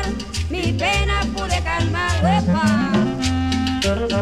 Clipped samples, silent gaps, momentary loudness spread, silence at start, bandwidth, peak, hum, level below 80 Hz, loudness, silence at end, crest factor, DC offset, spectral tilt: under 0.1%; none; 5 LU; 0 s; 13.5 kHz; -6 dBFS; none; -28 dBFS; -20 LUFS; 0 s; 14 dB; under 0.1%; -5 dB/octave